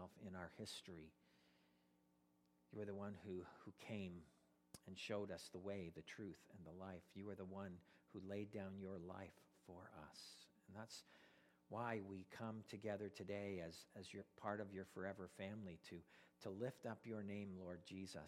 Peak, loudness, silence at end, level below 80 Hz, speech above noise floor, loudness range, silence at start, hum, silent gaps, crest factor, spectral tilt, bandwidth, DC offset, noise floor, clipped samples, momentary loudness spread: -30 dBFS; -54 LUFS; 0 s; -82 dBFS; 27 dB; 5 LU; 0 s; none; none; 24 dB; -5.5 dB/octave; 15.5 kHz; under 0.1%; -80 dBFS; under 0.1%; 12 LU